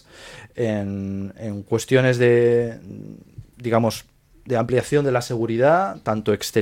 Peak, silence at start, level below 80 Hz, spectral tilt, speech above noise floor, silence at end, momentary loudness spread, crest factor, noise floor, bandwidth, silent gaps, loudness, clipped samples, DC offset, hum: -4 dBFS; 0.2 s; -54 dBFS; -6 dB/octave; 22 dB; 0 s; 20 LU; 18 dB; -43 dBFS; 16.5 kHz; none; -21 LUFS; under 0.1%; under 0.1%; none